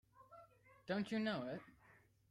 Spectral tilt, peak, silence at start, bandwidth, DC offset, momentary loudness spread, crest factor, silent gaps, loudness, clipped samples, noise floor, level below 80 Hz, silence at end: -6.5 dB/octave; -28 dBFS; 0.15 s; 11.5 kHz; under 0.1%; 23 LU; 18 dB; none; -43 LUFS; under 0.1%; -70 dBFS; -80 dBFS; 0.4 s